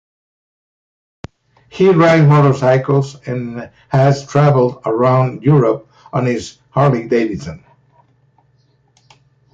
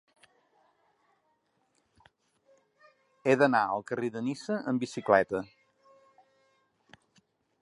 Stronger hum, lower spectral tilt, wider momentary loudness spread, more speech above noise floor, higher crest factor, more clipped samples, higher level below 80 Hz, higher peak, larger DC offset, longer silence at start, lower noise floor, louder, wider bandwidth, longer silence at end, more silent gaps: neither; first, -8 dB/octave vs -6 dB/octave; first, 14 LU vs 10 LU; about the same, 43 dB vs 46 dB; second, 14 dB vs 24 dB; neither; first, -50 dBFS vs -72 dBFS; first, -2 dBFS vs -8 dBFS; neither; second, 1.75 s vs 3.25 s; second, -56 dBFS vs -74 dBFS; first, -14 LUFS vs -29 LUFS; second, 7.6 kHz vs 11 kHz; second, 1.95 s vs 2.15 s; neither